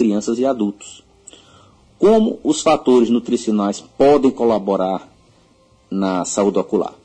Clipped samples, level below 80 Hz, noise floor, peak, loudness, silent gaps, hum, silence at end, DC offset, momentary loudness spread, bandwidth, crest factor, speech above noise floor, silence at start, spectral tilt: under 0.1%; -52 dBFS; -53 dBFS; -4 dBFS; -17 LUFS; none; none; 0.15 s; under 0.1%; 9 LU; 9.8 kHz; 14 dB; 37 dB; 0 s; -5.5 dB/octave